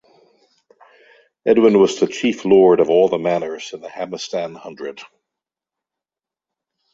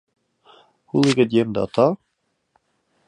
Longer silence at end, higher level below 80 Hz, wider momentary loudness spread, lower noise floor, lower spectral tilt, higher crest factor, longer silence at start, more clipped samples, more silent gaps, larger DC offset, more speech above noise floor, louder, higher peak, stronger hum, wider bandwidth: first, 1.9 s vs 1.15 s; about the same, -62 dBFS vs -60 dBFS; first, 19 LU vs 7 LU; first, -89 dBFS vs -72 dBFS; about the same, -5.5 dB/octave vs -6 dB/octave; about the same, 18 dB vs 20 dB; first, 1.45 s vs 0.95 s; neither; neither; neither; first, 72 dB vs 54 dB; first, -16 LUFS vs -19 LUFS; about the same, -2 dBFS vs -2 dBFS; neither; second, 7.8 kHz vs 11 kHz